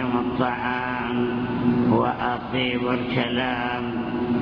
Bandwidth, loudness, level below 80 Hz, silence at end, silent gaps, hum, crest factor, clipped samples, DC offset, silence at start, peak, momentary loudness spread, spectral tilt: 5.4 kHz; -24 LUFS; -48 dBFS; 0 s; none; none; 18 dB; under 0.1%; under 0.1%; 0 s; -6 dBFS; 5 LU; -8.5 dB/octave